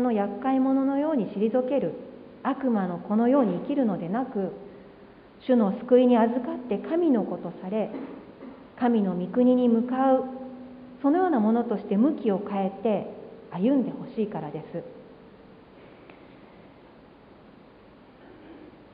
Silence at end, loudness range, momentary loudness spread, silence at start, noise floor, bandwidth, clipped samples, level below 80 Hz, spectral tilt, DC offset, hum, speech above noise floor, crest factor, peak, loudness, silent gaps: 0.25 s; 7 LU; 18 LU; 0 s; -52 dBFS; 4.7 kHz; under 0.1%; -66 dBFS; -11.5 dB/octave; under 0.1%; none; 27 dB; 18 dB; -8 dBFS; -25 LUFS; none